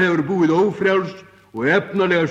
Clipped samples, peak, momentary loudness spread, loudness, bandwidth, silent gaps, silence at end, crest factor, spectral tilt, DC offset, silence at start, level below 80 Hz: under 0.1%; -4 dBFS; 8 LU; -18 LUFS; 8 kHz; none; 0 s; 14 dB; -7 dB/octave; under 0.1%; 0 s; -60 dBFS